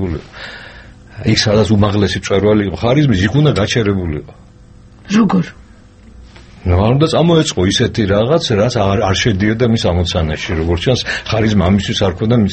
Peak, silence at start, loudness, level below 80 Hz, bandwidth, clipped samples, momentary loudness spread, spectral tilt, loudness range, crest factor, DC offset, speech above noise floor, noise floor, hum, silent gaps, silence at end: 0 dBFS; 0 s; -14 LUFS; -32 dBFS; 8.6 kHz; under 0.1%; 9 LU; -6 dB/octave; 4 LU; 14 dB; under 0.1%; 27 dB; -40 dBFS; none; none; 0 s